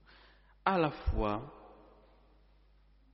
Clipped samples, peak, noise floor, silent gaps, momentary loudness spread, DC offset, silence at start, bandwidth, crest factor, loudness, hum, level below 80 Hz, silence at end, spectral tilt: under 0.1%; -14 dBFS; -64 dBFS; none; 19 LU; under 0.1%; 0.65 s; 5.8 kHz; 24 dB; -34 LUFS; none; -44 dBFS; 1.4 s; -5.5 dB/octave